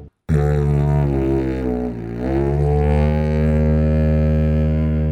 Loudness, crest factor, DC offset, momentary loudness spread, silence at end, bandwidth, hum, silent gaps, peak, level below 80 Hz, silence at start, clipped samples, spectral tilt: -18 LUFS; 12 dB; under 0.1%; 5 LU; 0 s; 4.9 kHz; none; none; -6 dBFS; -22 dBFS; 0 s; under 0.1%; -10 dB/octave